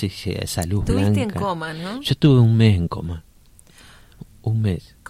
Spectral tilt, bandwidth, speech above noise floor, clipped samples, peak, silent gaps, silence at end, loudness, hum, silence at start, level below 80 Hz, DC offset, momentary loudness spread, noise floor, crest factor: -6.5 dB/octave; 15.5 kHz; 31 dB; under 0.1%; -4 dBFS; none; 0.3 s; -20 LUFS; none; 0 s; -38 dBFS; under 0.1%; 14 LU; -50 dBFS; 16 dB